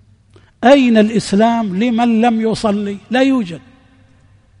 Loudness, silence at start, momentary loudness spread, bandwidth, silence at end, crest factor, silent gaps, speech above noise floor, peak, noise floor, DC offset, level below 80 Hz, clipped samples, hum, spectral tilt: -14 LUFS; 0.6 s; 9 LU; 10.5 kHz; 1 s; 14 dB; none; 36 dB; 0 dBFS; -49 dBFS; under 0.1%; -50 dBFS; under 0.1%; none; -6 dB/octave